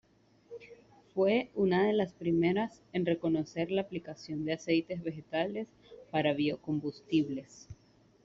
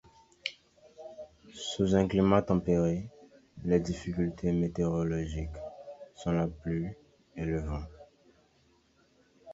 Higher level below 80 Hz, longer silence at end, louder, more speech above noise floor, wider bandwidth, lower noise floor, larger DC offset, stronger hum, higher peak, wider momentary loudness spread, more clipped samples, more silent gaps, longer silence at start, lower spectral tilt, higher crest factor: second, -68 dBFS vs -48 dBFS; first, 0.5 s vs 0 s; about the same, -32 LUFS vs -31 LUFS; second, 27 dB vs 38 dB; about the same, 7.6 kHz vs 7.8 kHz; second, -59 dBFS vs -67 dBFS; neither; neither; second, -14 dBFS vs -10 dBFS; second, 13 LU vs 22 LU; neither; neither; about the same, 0.5 s vs 0.45 s; second, -5.5 dB/octave vs -7 dB/octave; about the same, 18 dB vs 22 dB